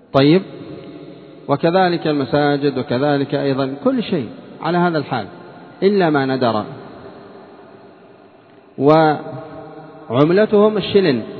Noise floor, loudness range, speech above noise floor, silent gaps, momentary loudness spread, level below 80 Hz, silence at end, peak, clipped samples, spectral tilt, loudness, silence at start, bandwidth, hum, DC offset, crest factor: -46 dBFS; 4 LU; 30 dB; none; 22 LU; -60 dBFS; 0 s; 0 dBFS; under 0.1%; -9.5 dB/octave; -17 LUFS; 0.15 s; 6 kHz; none; under 0.1%; 18 dB